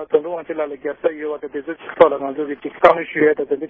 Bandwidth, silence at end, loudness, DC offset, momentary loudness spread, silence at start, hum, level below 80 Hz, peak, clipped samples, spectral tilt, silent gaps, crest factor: 6.6 kHz; 0 s; -19 LUFS; under 0.1%; 13 LU; 0 s; none; -56 dBFS; 0 dBFS; under 0.1%; -7 dB/octave; none; 18 dB